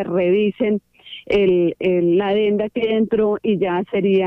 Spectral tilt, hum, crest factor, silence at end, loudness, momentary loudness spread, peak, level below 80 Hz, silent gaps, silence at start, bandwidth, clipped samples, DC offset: -9 dB/octave; none; 12 dB; 0 s; -18 LUFS; 5 LU; -6 dBFS; -52 dBFS; none; 0 s; 5.6 kHz; under 0.1%; under 0.1%